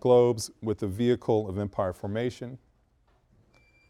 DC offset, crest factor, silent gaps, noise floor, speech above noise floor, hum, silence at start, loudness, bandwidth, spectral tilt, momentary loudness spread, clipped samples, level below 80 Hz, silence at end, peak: under 0.1%; 20 dB; none; -66 dBFS; 40 dB; none; 0.05 s; -28 LUFS; 14 kHz; -6.5 dB/octave; 11 LU; under 0.1%; -60 dBFS; 1.3 s; -8 dBFS